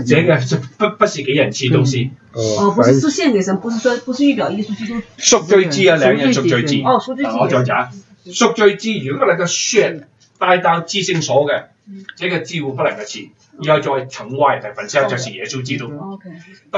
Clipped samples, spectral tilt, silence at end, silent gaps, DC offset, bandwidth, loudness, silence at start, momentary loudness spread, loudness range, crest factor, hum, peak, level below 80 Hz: under 0.1%; -4.5 dB/octave; 0 s; none; under 0.1%; 8.2 kHz; -16 LUFS; 0 s; 12 LU; 5 LU; 16 dB; none; 0 dBFS; -58 dBFS